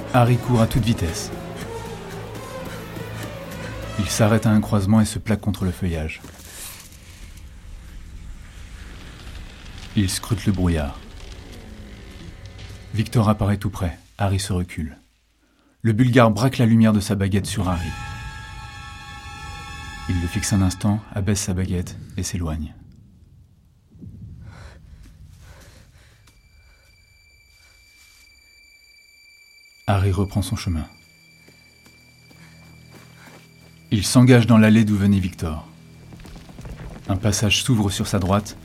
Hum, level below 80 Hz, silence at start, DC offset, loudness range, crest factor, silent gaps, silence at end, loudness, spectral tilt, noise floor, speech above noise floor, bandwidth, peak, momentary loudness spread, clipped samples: none; -40 dBFS; 0 s; under 0.1%; 14 LU; 22 dB; none; 0 s; -21 LUFS; -6 dB/octave; -61 dBFS; 42 dB; 16 kHz; -2 dBFS; 24 LU; under 0.1%